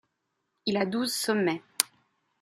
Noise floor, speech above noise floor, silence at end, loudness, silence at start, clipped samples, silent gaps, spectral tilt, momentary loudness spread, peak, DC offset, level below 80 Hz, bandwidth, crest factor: -80 dBFS; 52 dB; 0.55 s; -29 LUFS; 0.65 s; under 0.1%; none; -3 dB/octave; 4 LU; 0 dBFS; under 0.1%; -74 dBFS; 14 kHz; 30 dB